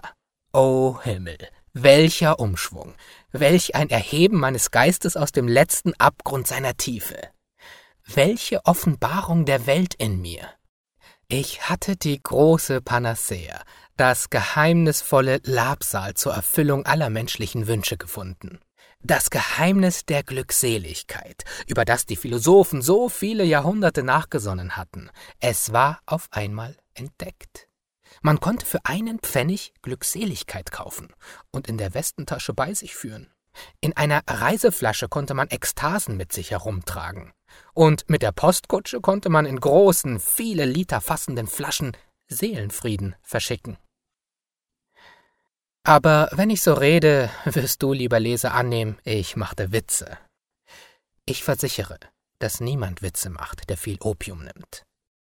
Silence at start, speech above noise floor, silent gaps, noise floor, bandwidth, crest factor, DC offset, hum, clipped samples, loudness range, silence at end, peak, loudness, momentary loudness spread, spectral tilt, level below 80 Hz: 0.05 s; over 69 dB; 10.69-10.84 s; under -90 dBFS; 19.5 kHz; 22 dB; 0.1%; none; under 0.1%; 9 LU; 0.45 s; 0 dBFS; -21 LUFS; 16 LU; -4.5 dB/octave; -48 dBFS